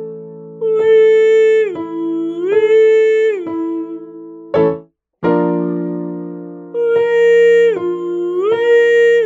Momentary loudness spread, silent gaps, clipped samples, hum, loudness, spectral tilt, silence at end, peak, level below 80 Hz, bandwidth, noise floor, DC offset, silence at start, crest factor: 18 LU; none; under 0.1%; none; -13 LUFS; -6.5 dB/octave; 0 s; -2 dBFS; -60 dBFS; 7.4 kHz; -34 dBFS; under 0.1%; 0 s; 10 dB